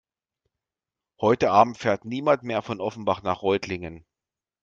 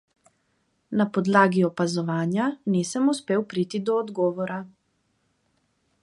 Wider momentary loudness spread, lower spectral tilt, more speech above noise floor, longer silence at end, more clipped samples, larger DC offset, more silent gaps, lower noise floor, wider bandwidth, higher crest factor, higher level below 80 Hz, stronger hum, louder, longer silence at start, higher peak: first, 12 LU vs 9 LU; about the same, -6 dB/octave vs -6 dB/octave; first, over 66 dB vs 47 dB; second, 0.65 s vs 1.35 s; neither; neither; neither; first, under -90 dBFS vs -71 dBFS; second, 7.6 kHz vs 11.5 kHz; about the same, 24 dB vs 22 dB; first, -60 dBFS vs -70 dBFS; neither; about the same, -24 LUFS vs -24 LUFS; first, 1.2 s vs 0.9 s; about the same, -2 dBFS vs -4 dBFS